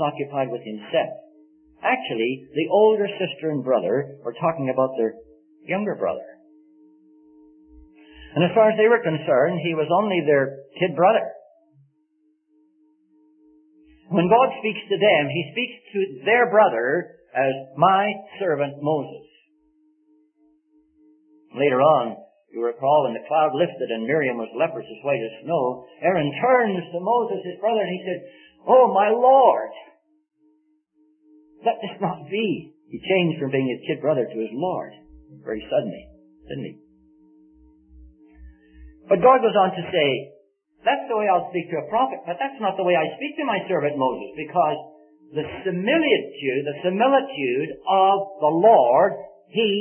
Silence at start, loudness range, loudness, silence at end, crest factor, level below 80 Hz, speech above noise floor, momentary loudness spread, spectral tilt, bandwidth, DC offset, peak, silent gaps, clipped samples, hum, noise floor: 0 s; 9 LU; -21 LUFS; 0 s; 20 dB; -60 dBFS; 45 dB; 13 LU; -10.5 dB/octave; 3.4 kHz; under 0.1%; -2 dBFS; none; under 0.1%; none; -66 dBFS